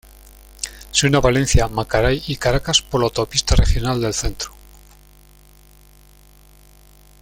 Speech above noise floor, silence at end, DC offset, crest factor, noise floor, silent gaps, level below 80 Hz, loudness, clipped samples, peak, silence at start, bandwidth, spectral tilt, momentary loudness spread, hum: 31 dB; 2.75 s; under 0.1%; 18 dB; -48 dBFS; none; -26 dBFS; -19 LUFS; under 0.1%; -2 dBFS; 0.6 s; 16.5 kHz; -4 dB/octave; 14 LU; 50 Hz at -40 dBFS